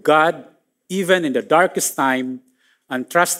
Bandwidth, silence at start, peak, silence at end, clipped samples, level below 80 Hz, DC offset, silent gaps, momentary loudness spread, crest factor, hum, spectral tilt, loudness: 16 kHz; 0.05 s; -2 dBFS; 0 s; under 0.1%; -76 dBFS; under 0.1%; none; 13 LU; 18 dB; none; -3.5 dB/octave; -18 LUFS